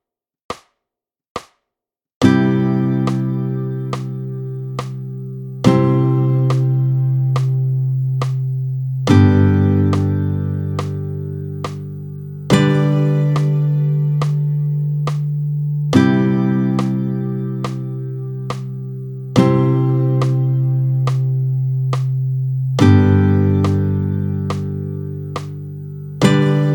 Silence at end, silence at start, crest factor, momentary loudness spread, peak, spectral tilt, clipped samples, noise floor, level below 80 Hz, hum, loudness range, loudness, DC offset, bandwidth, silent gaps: 0 s; 0.5 s; 16 dB; 14 LU; 0 dBFS; -8 dB/octave; under 0.1%; -85 dBFS; -52 dBFS; none; 4 LU; -17 LUFS; under 0.1%; 18.5 kHz; 1.30-1.35 s, 2.14-2.21 s